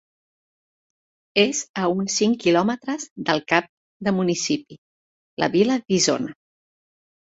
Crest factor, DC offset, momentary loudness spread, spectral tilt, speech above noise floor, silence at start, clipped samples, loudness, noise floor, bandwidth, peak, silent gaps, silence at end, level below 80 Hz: 20 dB; under 0.1%; 8 LU; -4 dB/octave; over 69 dB; 1.35 s; under 0.1%; -22 LUFS; under -90 dBFS; 8.2 kHz; -2 dBFS; 1.69-1.74 s, 3.11-3.16 s, 3.69-4.00 s, 4.78-5.37 s; 0.9 s; -64 dBFS